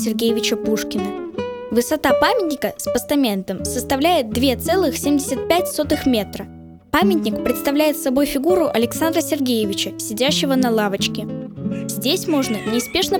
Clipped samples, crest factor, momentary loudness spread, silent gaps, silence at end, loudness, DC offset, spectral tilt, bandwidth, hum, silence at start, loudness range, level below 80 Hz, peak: under 0.1%; 18 dB; 8 LU; none; 0 s; -19 LUFS; under 0.1%; -4 dB/octave; over 20 kHz; none; 0 s; 2 LU; -46 dBFS; -2 dBFS